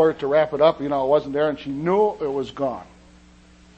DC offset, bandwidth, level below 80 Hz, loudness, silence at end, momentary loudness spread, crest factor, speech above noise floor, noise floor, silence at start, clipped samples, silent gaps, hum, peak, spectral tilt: under 0.1%; 8.2 kHz; -54 dBFS; -21 LUFS; 0.95 s; 8 LU; 18 dB; 29 dB; -50 dBFS; 0 s; under 0.1%; none; none; -4 dBFS; -7 dB/octave